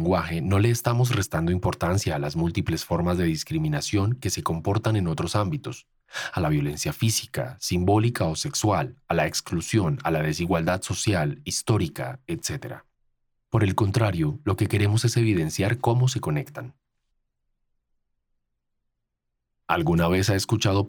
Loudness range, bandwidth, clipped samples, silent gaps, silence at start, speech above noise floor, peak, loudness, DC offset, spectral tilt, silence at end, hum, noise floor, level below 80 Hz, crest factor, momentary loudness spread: 4 LU; 19.5 kHz; under 0.1%; none; 0 s; 56 dB; -6 dBFS; -25 LUFS; under 0.1%; -5.5 dB/octave; 0 s; none; -80 dBFS; -46 dBFS; 20 dB; 8 LU